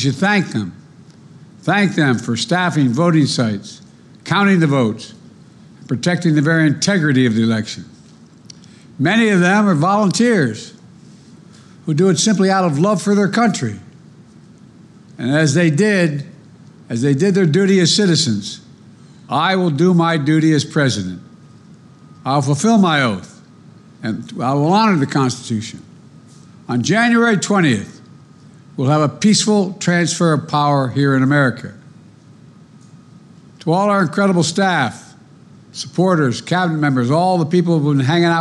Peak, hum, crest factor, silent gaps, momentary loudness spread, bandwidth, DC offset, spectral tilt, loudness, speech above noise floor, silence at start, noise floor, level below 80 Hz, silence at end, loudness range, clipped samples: -4 dBFS; none; 12 dB; none; 14 LU; 11.5 kHz; under 0.1%; -5.5 dB/octave; -15 LUFS; 29 dB; 0 s; -43 dBFS; -62 dBFS; 0 s; 3 LU; under 0.1%